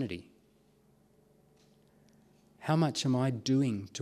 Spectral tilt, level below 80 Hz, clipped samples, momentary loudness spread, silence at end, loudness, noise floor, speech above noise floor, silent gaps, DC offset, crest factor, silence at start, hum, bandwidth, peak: -6 dB/octave; -72 dBFS; under 0.1%; 12 LU; 0 s; -31 LUFS; -66 dBFS; 36 dB; none; under 0.1%; 20 dB; 0 s; none; 13 kHz; -14 dBFS